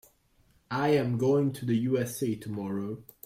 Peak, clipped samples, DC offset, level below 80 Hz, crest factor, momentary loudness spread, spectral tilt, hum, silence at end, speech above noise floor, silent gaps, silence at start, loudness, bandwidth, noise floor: -14 dBFS; under 0.1%; under 0.1%; -64 dBFS; 16 dB; 9 LU; -7 dB/octave; none; 0.25 s; 37 dB; none; 0.7 s; -29 LUFS; 16 kHz; -66 dBFS